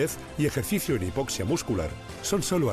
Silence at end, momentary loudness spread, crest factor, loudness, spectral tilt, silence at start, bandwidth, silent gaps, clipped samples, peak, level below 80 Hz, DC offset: 0 s; 5 LU; 14 dB; -28 LUFS; -5 dB/octave; 0 s; 15 kHz; none; under 0.1%; -14 dBFS; -46 dBFS; under 0.1%